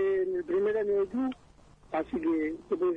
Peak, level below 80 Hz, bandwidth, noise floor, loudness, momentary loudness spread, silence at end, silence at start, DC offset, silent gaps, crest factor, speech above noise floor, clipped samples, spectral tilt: -20 dBFS; -60 dBFS; 5 kHz; -56 dBFS; -30 LUFS; 7 LU; 0 s; 0 s; under 0.1%; none; 10 dB; 27 dB; under 0.1%; -7.5 dB/octave